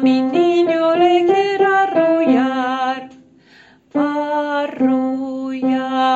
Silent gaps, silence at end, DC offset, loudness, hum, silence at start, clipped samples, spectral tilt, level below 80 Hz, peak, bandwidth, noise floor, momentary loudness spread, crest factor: none; 0 s; under 0.1%; -16 LUFS; none; 0 s; under 0.1%; -5.5 dB/octave; -60 dBFS; -2 dBFS; 7.8 kHz; -48 dBFS; 8 LU; 14 dB